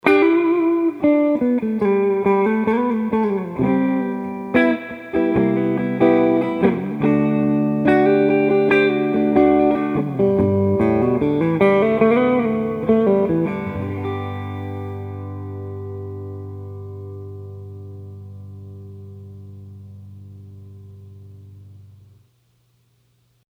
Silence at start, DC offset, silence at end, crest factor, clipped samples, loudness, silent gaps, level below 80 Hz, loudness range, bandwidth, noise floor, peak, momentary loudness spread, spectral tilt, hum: 0.05 s; under 0.1%; 1.75 s; 18 dB; under 0.1%; -18 LUFS; none; -50 dBFS; 20 LU; 5.4 kHz; -61 dBFS; 0 dBFS; 21 LU; -9 dB/octave; none